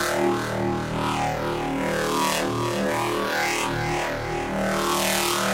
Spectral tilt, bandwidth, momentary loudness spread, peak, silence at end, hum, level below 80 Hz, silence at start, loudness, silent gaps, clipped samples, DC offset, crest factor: -4 dB/octave; 16 kHz; 5 LU; -6 dBFS; 0 s; none; -44 dBFS; 0 s; -24 LUFS; none; under 0.1%; under 0.1%; 18 dB